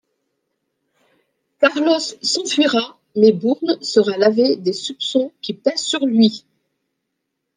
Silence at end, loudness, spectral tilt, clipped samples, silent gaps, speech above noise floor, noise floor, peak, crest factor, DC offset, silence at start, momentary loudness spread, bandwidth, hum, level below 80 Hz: 1.2 s; -17 LUFS; -4 dB/octave; under 0.1%; none; 59 dB; -76 dBFS; -2 dBFS; 18 dB; under 0.1%; 1.6 s; 7 LU; 10 kHz; none; -68 dBFS